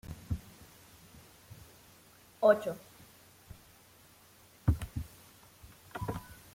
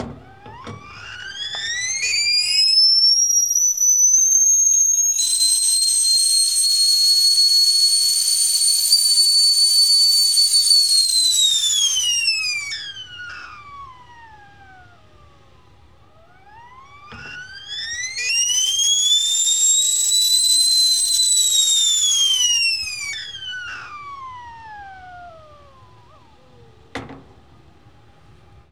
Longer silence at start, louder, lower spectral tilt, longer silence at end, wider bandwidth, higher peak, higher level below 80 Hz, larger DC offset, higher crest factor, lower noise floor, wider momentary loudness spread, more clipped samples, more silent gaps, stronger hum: about the same, 0.05 s vs 0 s; second, -34 LUFS vs -13 LUFS; first, -6.5 dB/octave vs 3 dB/octave; second, 0.2 s vs 1.5 s; second, 16.5 kHz vs over 20 kHz; second, -12 dBFS vs -2 dBFS; first, -50 dBFS vs -58 dBFS; second, under 0.1% vs 0.3%; first, 24 dB vs 18 dB; first, -60 dBFS vs -51 dBFS; first, 28 LU vs 21 LU; neither; neither; neither